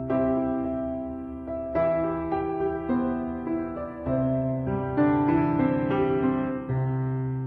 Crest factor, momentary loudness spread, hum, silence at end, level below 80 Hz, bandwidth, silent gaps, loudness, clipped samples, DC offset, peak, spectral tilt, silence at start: 14 dB; 9 LU; none; 0 s; -46 dBFS; 4.4 kHz; none; -27 LUFS; under 0.1%; under 0.1%; -12 dBFS; -11.5 dB/octave; 0 s